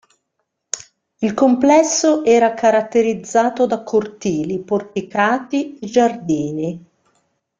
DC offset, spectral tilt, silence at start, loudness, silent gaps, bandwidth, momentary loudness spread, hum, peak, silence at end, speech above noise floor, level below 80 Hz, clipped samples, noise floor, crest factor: under 0.1%; -4.5 dB/octave; 0.75 s; -17 LUFS; none; 9.6 kHz; 12 LU; none; -2 dBFS; 0.8 s; 57 dB; -60 dBFS; under 0.1%; -74 dBFS; 16 dB